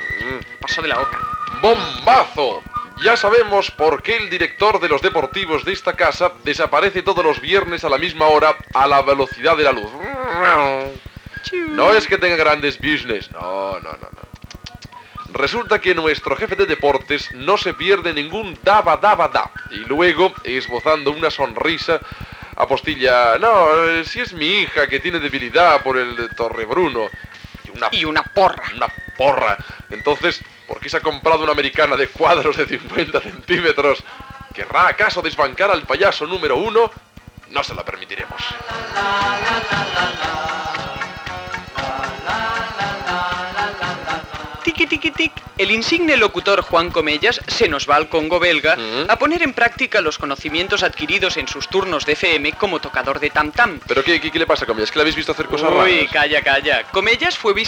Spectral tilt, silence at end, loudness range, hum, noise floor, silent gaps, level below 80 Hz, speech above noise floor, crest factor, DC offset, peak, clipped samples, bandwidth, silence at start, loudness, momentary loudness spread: -4 dB/octave; 0 s; 5 LU; none; -38 dBFS; none; -44 dBFS; 21 dB; 14 dB; under 0.1%; -2 dBFS; under 0.1%; 16.5 kHz; 0 s; -17 LUFS; 12 LU